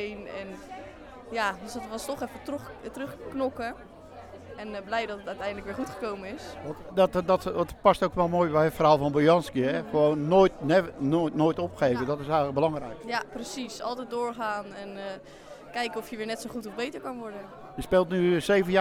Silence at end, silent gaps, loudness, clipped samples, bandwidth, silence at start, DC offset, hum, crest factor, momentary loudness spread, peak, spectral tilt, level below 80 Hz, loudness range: 0 s; none; -27 LUFS; under 0.1%; 16.5 kHz; 0 s; under 0.1%; none; 22 dB; 18 LU; -6 dBFS; -6 dB/octave; -54 dBFS; 12 LU